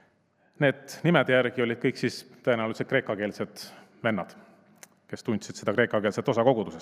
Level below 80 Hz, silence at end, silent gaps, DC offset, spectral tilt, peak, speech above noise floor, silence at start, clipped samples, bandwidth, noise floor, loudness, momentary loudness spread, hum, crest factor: -76 dBFS; 0 s; none; under 0.1%; -6 dB/octave; -4 dBFS; 40 dB; 0.6 s; under 0.1%; 15.5 kHz; -66 dBFS; -27 LUFS; 13 LU; none; 24 dB